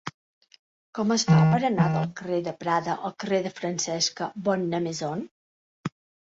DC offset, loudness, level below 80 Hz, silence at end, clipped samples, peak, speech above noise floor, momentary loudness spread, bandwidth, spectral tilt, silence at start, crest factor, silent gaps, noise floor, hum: under 0.1%; -25 LUFS; -64 dBFS; 0.4 s; under 0.1%; -10 dBFS; over 65 dB; 18 LU; 8 kHz; -5 dB/octave; 0.05 s; 16 dB; 0.14-0.41 s, 0.59-0.93 s, 5.31-5.84 s; under -90 dBFS; none